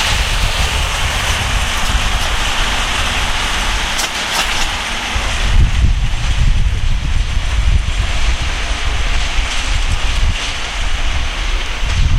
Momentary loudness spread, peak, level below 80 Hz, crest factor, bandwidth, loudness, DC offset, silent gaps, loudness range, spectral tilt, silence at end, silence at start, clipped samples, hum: 4 LU; 0 dBFS; -16 dBFS; 14 dB; 15.5 kHz; -17 LUFS; under 0.1%; none; 3 LU; -3 dB/octave; 0 s; 0 s; under 0.1%; none